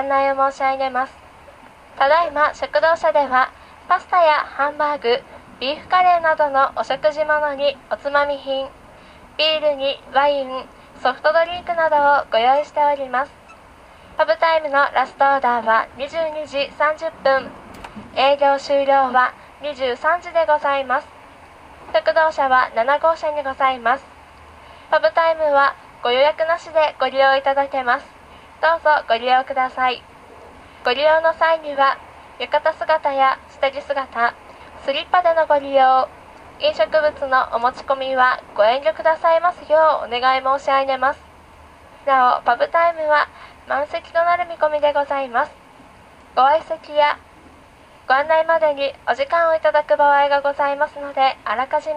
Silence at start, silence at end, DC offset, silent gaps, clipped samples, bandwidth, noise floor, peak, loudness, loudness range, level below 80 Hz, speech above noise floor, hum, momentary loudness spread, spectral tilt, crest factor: 0 s; 0 s; under 0.1%; none; under 0.1%; 10 kHz; -46 dBFS; -2 dBFS; -18 LUFS; 3 LU; -54 dBFS; 29 dB; none; 8 LU; -3.5 dB/octave; 18 dB